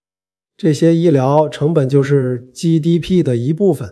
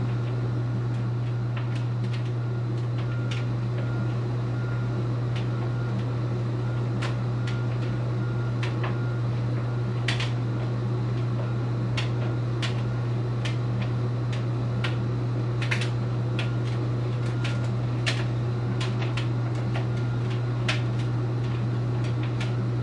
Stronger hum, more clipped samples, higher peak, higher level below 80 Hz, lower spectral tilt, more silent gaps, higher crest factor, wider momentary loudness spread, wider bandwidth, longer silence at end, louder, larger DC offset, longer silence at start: neither; neither; first, 0 dBFS vs -10 dBFS; about the same, -50 dBFS vs -48 dBFS; about the same, -8 dB/octave vs -7 dB/octave; neither; about the same, 14 dB vs 16 dB; first, 5 LU vs 2 LU; first, 12 kHz vs 9.4 kHz; about the same, 0 s vs 0 s; first, -15 LUFS vs -28 LUFS; neither; first, 0.65 s vs 0 s